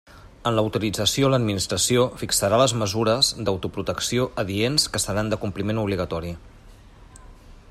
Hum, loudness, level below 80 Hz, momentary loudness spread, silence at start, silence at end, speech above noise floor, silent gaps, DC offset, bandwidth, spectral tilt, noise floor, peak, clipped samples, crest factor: none; -22 LUFS; -46 dBFS; 8 LU; 0.15 s; 0.15 s; 24 dB; none; under 0.1%; 16 kHz; -4 dB/octave; -47 dBFS; -4 dBFS; under 0.1%; 20 dB